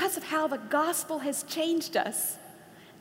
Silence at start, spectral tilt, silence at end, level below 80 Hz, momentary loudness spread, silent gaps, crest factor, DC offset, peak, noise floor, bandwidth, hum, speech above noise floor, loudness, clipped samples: 0 s; -2 dB/octave; 0 s; -80 dBFS; 5 LU; none; 18 dB; under 0.1%; -14 dBFS; -52 dBFS; 16 kHz; none; 22 dB; -29 LUFS; under 0.1%